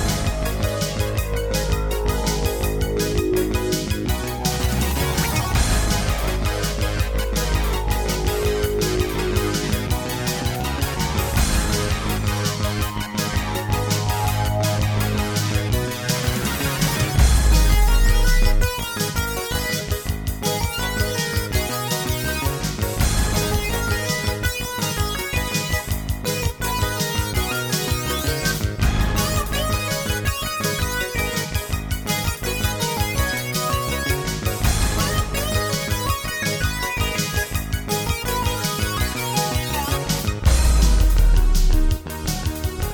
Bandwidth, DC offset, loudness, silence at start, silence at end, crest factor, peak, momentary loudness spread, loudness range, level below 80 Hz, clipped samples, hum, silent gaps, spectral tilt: over 20 kHz; 0.1%; -22 LUFS; 0 s; 0 s; 16 dB; -4 dBFS; 4 LU; 3 LU; -24 dBFS; under 0.1%; none; none; -4 dB/octave